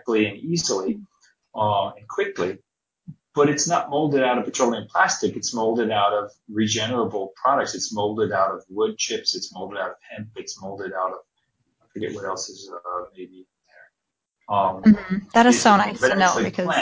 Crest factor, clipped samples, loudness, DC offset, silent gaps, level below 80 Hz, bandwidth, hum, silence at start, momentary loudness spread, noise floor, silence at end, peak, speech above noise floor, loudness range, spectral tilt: 20 dB; under 0.1%; -22 LUFS; under 0.1%; none; -60 dBFS; 8 kHz; none; 0.05 s; 16 LU; -82 dBFS; 0 s; -2 dBFS; 60 dB; 12 LU; -4 dB/octave